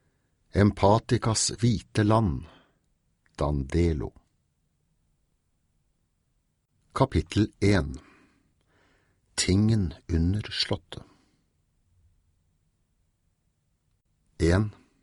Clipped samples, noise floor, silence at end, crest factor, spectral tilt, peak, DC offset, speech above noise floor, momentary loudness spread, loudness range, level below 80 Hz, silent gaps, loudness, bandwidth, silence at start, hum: under 0.1%; -73 dBFS; 0.3 s; 22 dB; -5.5 dB/octave; -8 dBFS; under 0.1%; 49 dB; 12 LU; 9 LU; -42 dBFS; none; -26 LUFS; 11.5 kHz; 0.55 s; none